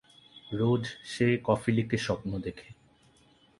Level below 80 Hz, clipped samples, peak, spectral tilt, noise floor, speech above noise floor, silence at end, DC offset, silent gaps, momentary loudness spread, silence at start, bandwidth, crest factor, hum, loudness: -58 dBFS; under 0.1%; -10 dBFS; -6.5 dB/octave; -62 dBFS; 34 dB; 0.85 s; under 0.1%; none; 13 LU; 0.35 s; 11.5 kHz; 20 dB; none; -30 LUFS